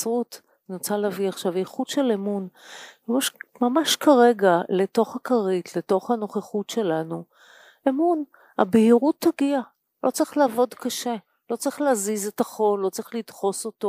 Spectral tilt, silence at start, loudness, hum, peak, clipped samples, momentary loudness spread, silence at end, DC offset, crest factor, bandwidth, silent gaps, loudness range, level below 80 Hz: -4.5 dB/octave; 0 s; -23 LUFS; none; -4 dBFS; under 0.1%; 15 LU; 0 s; under 0.1%; 20 dB; 15.5 kHz; none; 5 LU; -76 dBFS